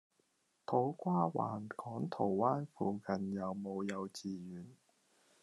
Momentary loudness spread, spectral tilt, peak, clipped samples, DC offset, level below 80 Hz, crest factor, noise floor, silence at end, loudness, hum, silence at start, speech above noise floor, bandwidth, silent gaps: 12 LU; -7.5 dB/octave; -18 dBFS; under 0.1%; under 0.1%; -84 dBFS; 22 dB; -78 dBFS; 0.7 s; -38 LUFS; none; 0.7 s; 40 dB; 12 kHz; none